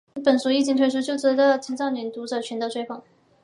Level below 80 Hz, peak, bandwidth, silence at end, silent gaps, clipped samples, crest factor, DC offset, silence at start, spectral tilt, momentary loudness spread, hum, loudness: -76 dBFS; -6 dBFS; 11.5 kHz; 0.45 s; none; under 0.1%; 16 dB; under 0.1%; 0.15 s; -3.5 dB/octave; 11 LU; none; -23 LUFS